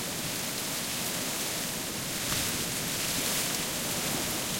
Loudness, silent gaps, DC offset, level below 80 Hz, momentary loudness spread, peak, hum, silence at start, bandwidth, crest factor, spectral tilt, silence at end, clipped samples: -29 LUFS; none; under 0.1%; -56 dBFS; 4 LU; -16 dBFS; none; 0 s; 16.5 kHz; 16 dB; -1.5 dB/octave; 0 s; under 0.1%